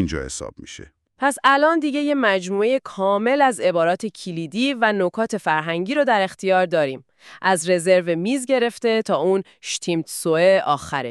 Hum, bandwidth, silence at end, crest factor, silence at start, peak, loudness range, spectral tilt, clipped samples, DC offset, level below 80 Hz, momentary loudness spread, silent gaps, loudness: none; 13.5 kHz; 0 s; 16 dB; 0 s; -4 dBFS; 2 LU; -4.5 dB/octave; under 0.1%; under 0.1%; -50 dBFS; 11 LU; none; -20 LUFS